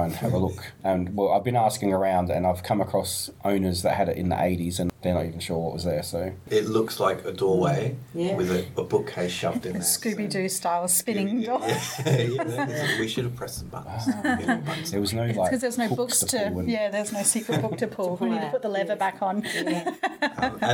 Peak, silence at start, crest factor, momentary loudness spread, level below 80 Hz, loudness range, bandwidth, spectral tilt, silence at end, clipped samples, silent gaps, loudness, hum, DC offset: -6 dBFS; 0 s; 20 dB; 6 LU; -54 dBFS; 2 LU; 19 kHz; -4.5 dB/octave; 0 s; under 0.1%; none; -26 LUFS; none; under 0.1%